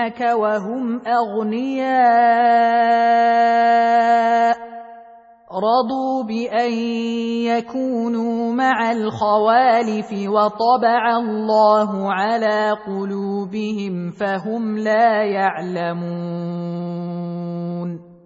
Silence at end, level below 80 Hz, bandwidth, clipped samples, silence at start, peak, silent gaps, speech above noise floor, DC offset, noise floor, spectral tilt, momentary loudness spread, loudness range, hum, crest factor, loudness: 0.1 s; -66 dBFS; 7.8 kHz; under 0.1%; 0 s; -4 dBFS; none; 27 dB; under 0.1%; -45 dBFS; -6.5 dB/octave; 11 LU; 6 LU; none; 14 dB; -18 LUFS